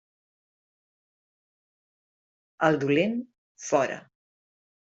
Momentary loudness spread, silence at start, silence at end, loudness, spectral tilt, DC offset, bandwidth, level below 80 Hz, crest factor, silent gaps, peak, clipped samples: 17 LU; 2.6 s; 0.8 s; -26 LUFS; -5.5 dB/octave; under 0.1%; 8 kHz; -72 dBFS; 24 dB; 3.38-3.55 s; -6 dBFS; under 0.1%